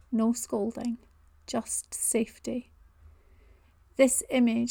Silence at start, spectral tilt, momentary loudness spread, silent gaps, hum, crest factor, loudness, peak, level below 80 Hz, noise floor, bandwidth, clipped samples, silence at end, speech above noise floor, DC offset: 0.1 s; -3.5 dB/octave; 14 LU; none; none; 20 dB; -28 LUFS; -10 dBFS; -60 dBFS; -59 dBFS; 19 kHz; under 0.1%; 0 s; 31 dB; under 0.1%